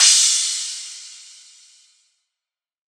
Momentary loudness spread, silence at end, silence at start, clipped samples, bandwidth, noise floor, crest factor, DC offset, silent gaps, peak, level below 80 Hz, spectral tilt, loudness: 26 LU; 1.7 s; 0 s; under 0.1%; over 20 kHz; -88 dBFS; 20 dB; under 0.1%; none; -2 dBFS; under -90 dBFS; 12 dB/octave; -16 LUFS